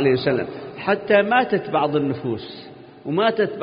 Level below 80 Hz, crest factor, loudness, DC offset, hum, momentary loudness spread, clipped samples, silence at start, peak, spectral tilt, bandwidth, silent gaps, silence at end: -60 dBFS; 18 dB; -21 LUFS; under 0.1%; none; 14 LU; under 0.1%; 0 s; -4 dBFS; -11 dB/octave; 5.2 kHz; none; 0 s